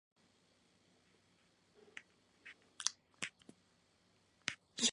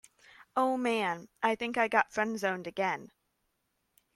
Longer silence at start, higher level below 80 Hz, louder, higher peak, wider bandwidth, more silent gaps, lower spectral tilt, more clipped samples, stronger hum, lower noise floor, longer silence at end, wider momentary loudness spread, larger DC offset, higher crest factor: first, 1.95 s vs 0.55 s; second, -88 dBFS vs -74 dBFS; second, -42 LUFS vs -31 LUFS; about the same, -10 dBFS vs -10 dBFS; second, 11 kHz vs 16 kHz; neither; second, 0 dB/octave vs -4.5 dB/octave; neither; neither; second, -74 dBFS vs -79 dBFS; second, 0 s vs 1.1 s; first, 19 LU vs 6 LU; neither; first, 38 dB vs 22 dB